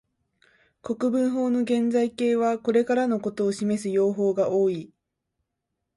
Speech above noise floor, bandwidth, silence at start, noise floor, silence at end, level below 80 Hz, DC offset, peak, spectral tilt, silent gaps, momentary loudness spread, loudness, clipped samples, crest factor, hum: 58 dB; 11.5 kHz; 0.85 s; -81 dBFS; 1.1 s; -68 dBFS; under 0.1%; -10 dBFS; -6.5 dB/octave; none; 4 LU; -24 LUFS; under 0.1%; 14 dB; none